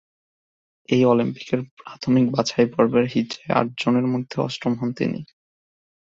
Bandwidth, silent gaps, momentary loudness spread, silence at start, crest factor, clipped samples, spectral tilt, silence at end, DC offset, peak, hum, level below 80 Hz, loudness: 7.6 kHz; 1.71-1.77 s; 9 LU; 0.9 s; 20 dB; under 0.1%; -6.5 dB/octave; 0.8 s; under 0.1%; -4 dBFS; none; -60 dBFS; -22 LUFS